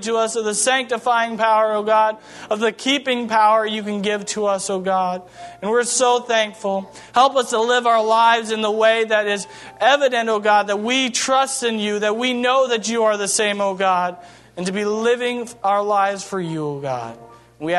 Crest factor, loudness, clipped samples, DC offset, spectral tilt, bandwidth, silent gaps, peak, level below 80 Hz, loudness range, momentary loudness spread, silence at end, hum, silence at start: 16 dB; -18 LUFS; under 0.1%; under 0.1%; -2.5 dB/octave; 12.5 kHz; none; -2 dBFS; -66 dBFS; 3 LU; 9 LU; 0 s; none; 0 s